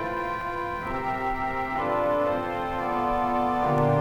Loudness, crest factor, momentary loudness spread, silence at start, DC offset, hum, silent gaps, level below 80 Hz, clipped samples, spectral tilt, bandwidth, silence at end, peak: -27 LUFS; 16 dB; 6 LU; 0 s; under 0.1%; none; none; -44 dBFS; under 0.1%; -7.5 dB/octave; 17 kHz; 0 s; -10 dBFS